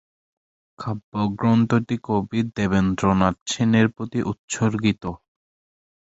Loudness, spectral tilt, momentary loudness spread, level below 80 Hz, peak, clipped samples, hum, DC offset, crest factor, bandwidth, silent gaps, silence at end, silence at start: -22 LUFS; -6 dB/octave; 11 LU; -46 dBFS; -2 dBFS; under 0.1%; none; under 0.1%; 20 dB; 8 kHz; 1.04-1.12 s, 3.41-3.46 s, 4.39-4.48 s; 1 s; 0.8 s